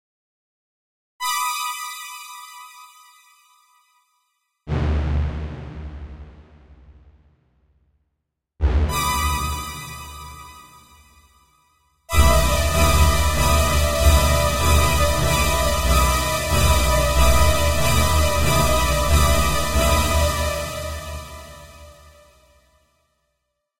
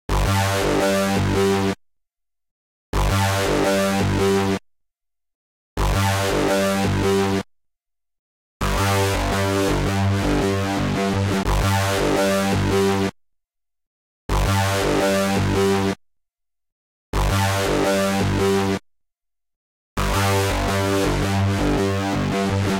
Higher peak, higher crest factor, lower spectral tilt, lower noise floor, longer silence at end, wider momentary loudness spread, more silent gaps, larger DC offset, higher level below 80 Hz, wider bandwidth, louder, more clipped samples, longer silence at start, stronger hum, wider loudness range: first, -2 dBFS vs -8 dBFS; first, 18 dB vs 12 dB; about the same, -4 dB/octave vs -5 dB/octave; about the same, -78 dBFS vs -77 dBFS; about the same, 0 s vs 0 s; first, 20 LU vs 6 LU; second, none vs 2.51-2.93 s, 5.35-5.76 s, 8.19-8.60 s, 13.87-14.29 s, 16.72-17.13 s, 19.56-19.96 s; neither; first, -24 dBFS vs -32 dBFS; about the same, 16 kHz vs 17 kHz; about the same, -19 LUFS vs -20 LUFS; neither; first, 1.2 s vs 0.1 s; neither; first, 13 LU vs 2 LU